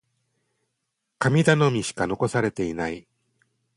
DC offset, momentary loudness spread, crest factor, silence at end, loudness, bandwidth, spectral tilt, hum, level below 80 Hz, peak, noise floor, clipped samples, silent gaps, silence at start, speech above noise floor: under 0.1%; 11 LU; 22 dB; 0.75 s; -23 LUFS; 11.5 kHz; -6 dB/octave; none; -56 dBFS; -4 dBFS; -79 dBFS; under 0.1%; none; 1.2 s; 57 dB